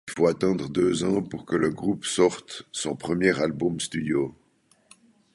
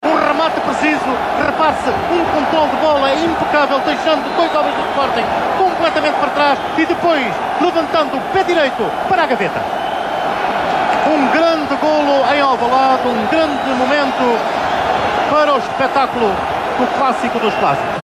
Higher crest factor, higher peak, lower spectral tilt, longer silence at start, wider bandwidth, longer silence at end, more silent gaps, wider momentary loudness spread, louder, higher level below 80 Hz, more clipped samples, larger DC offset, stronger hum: first, 20 dB vs 10 dB; about the same, -6 dBFS vs -4 dBFS; about the same, -5 dB/octave vs -4.5 dB/octave; about the same, 0.05 s vs 0 s; second, 11.5 kHz vs 15 kHz; first, 1.05 s vs 0 s; neither; first, 8 LU vs 4 LU; second, -25 LUFS vs -15 LUFS; second, -56 dBFS vs -46 dBFS; neither; neither; neither